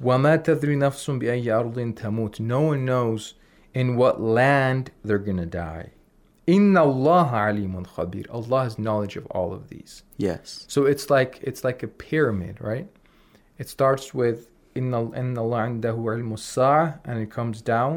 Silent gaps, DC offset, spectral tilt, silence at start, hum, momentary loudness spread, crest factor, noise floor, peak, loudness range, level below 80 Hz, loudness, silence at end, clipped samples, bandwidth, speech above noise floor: none; under 0.1%; -7 dB/octave; 0 s; none; 13 LU; 16 dB; -57 dBFS; -8 dBFS; 5 LU; -56 dBFS; -23 LUFS; 0 s; under 0.1%; 18 kHz; 34 dB